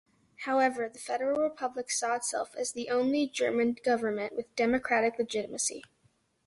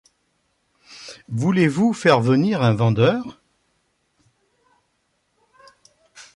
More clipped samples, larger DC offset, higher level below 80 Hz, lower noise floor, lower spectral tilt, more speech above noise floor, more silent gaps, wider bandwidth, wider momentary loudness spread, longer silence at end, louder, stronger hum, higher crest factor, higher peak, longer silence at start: neither; neither; second, -68 dBFS vs -58 dBFS; about the same, -70 dBFS vs -69 dBFS; second, -2.5 dB/octave vs -7 dB/octave; second, 40 dB vs 52 dB; neither; about the same, 11.5 kHz vs 11.5 kHz; second, 7 LU vs 21 LU; first, 0.65 s vs 0.15 s; second, -30 LUFS vs -19 LUFS; neither; about the same, 16 dB vs 18 dB; second, -14 dBFS vs -4 dBFS; second, 0.4 s vs 0.9 s